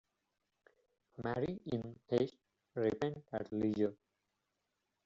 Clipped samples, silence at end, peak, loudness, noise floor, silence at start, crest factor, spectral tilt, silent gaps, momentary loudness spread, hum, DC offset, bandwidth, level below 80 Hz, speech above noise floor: under 0.1%; 1.1 s; -20 dBFS; -39 LUFS; -86 dBFS; 1.2 s; 20 dB; -6.5 dB/octave; none; 8 LU; none; under 0.1%; 7.6 kHz; -70 dBFS; 49 dB